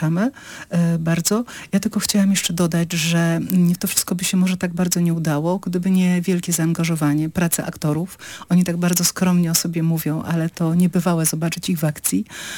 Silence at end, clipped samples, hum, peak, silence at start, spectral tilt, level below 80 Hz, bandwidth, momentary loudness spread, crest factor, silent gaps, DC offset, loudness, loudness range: 0 s; under 0.1%; none; -2 dBFS; 0 s; -5 dB/octave; -54 dBFS; 19 kHz; 6 LU; 18 dB; none; under 0.1%; -19 LUFS; 1 LU